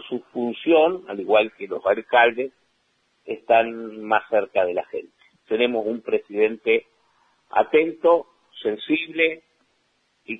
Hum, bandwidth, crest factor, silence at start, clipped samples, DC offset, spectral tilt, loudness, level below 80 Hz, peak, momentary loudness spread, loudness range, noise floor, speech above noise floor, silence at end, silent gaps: none; 4 kHz; 20 dB; 0 s; under 0.1%; under 0.1%; -6.5 dB/octave; -22 LUFS; -72 dBFS; -4 dBFS; 13 LU; 3 LU; -68 dBFS; 47 dB; 0 s; none